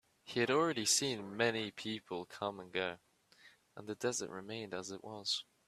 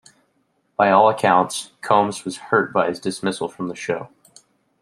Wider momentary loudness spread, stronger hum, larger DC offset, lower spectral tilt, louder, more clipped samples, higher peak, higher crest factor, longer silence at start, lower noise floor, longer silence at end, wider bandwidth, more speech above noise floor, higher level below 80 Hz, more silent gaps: about the same, 14 LU vs 14 LU; neither; neither; second, -2.5 dB/octave vs -4.5 dB/octave; second, -37 LUFS vs -20 LUFS; neither; second, -16 dBFS vs 0 dBFS; about the same, 22 dB vs 20 dB; second, 0.25 s vs 0.8 s; about the same, -65 dBFS vs -67 dBFS; second, 0.25 s vs 0.75 s; about the same, 14.5 kHz vs 14 kHz; second, 27 dB vs 47 dB; second, -78 dBFS vs -66 dBFS; neither